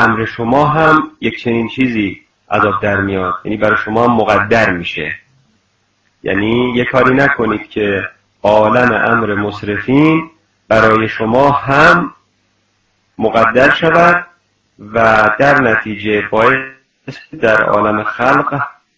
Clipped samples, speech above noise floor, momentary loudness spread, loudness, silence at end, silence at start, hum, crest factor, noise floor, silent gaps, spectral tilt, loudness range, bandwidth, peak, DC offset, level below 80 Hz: 0.5%; 48 dB; 10 LU; -12 LUFS; 0.25 s; 0 s; none; 12 dB; -60 dBFS; none; -6.5 dB/octave; 3 LU; 8 kHz; 0 dBFS; under 0.1%; -42 dBFS